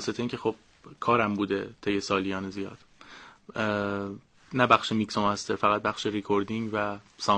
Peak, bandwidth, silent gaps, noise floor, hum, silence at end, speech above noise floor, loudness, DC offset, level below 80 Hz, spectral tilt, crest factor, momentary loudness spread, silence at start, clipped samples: -4 dBFS; 10 kHz; none; -50 dBFS; none; 0 s; 22 dB; -28 LUFS; under 0.1%; -62 dBFS; -5 dB/octave; 24 dB; 15 LU; 0 s; under 0.1%